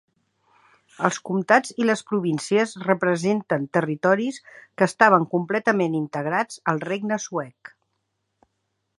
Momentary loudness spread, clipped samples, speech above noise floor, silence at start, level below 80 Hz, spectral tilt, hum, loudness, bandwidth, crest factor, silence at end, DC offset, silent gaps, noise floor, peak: 9 LU; under 0.1%; 53 dB; 1 s; -74 dBFS; -5.5 dB/octave; none; -22 LUFS; 11.5 kHz; 22 dB; 1.5 s; under 0.1%; none; -76 dBFS; -2 dBFS